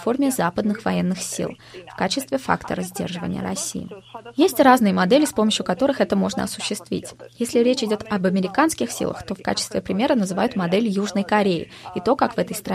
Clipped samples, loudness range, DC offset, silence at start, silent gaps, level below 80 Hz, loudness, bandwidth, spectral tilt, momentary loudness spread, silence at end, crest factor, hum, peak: under 0.1%; 6 LU; under 0.1%; 0 s; none; -54 dBFS; -21 LUFS; 15.5 kHz; -4.5 dB/octave; 11 LU; 0 s; 20 dB; none; -2 dBFS